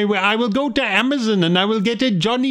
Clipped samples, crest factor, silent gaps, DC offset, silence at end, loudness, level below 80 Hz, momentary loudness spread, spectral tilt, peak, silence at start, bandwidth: under 0.1%; 16 dB; none; under 0.1%; 0 s; -17 LUFS; -52 dBFS; 2 LU; -5.5 dB/octave; -2 dBFS; 0 s; 11 kHz